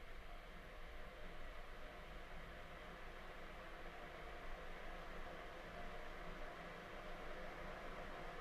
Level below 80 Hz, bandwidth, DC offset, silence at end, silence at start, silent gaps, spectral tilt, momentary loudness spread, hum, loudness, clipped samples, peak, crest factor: -56 dBFS; 13.5 kHz; under 0.1%; 0 s; 0 s; none; -5 dB/octave; 4 LU; none; -54 LUFS; under 0.1%; -38 dBFS; 12 dB